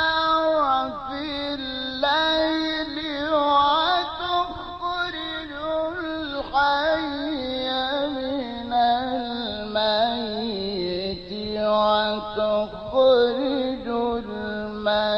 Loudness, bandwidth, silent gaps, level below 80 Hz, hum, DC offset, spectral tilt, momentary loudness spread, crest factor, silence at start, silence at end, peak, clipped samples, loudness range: -23 LUFS; 6.2 kHz; none; -48 dBFS; none; under 0.1%; -5.5 dB/octave; 9 LU; 16 dB; 0 s; 0 s; -8 dBFS; under 0.1%; 3 LU